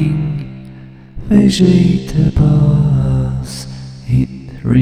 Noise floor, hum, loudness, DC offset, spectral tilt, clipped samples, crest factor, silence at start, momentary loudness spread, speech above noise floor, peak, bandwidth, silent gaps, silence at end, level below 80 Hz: -34 dBFS; none; -13 LUFS; under 0.1%; -7.5 dB/octave; under 0.1%; 14 dB; 0 s; 19 LU; 25 dB; 0 dBFS; 11.5 kHz; none; 0 s; -28 dBFS